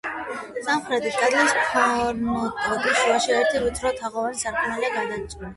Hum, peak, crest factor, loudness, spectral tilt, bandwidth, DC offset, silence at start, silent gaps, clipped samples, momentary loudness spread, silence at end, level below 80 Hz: none; -6 dBFS; 16 dB; -23 LUFS; -2.5 dB/octave; 11.5 kHz; under 0.1%; 0.05 s; none; under 0.1%; 10 LU; 0 s; -48 dBFS